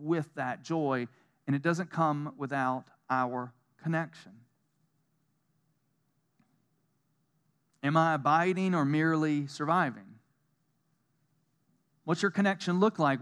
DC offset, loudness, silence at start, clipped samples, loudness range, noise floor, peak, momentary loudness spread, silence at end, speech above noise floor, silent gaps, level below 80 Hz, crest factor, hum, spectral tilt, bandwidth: under 0.1%; -30 LUFS; 0 s; under 0.1%; 10 LU; -76 dBFS; -12 dBFS; 12 LU; 0 s; 47 dB; none; under -90 dBFS; 20 dB; none; -6.5 dB/octave; 11 kHz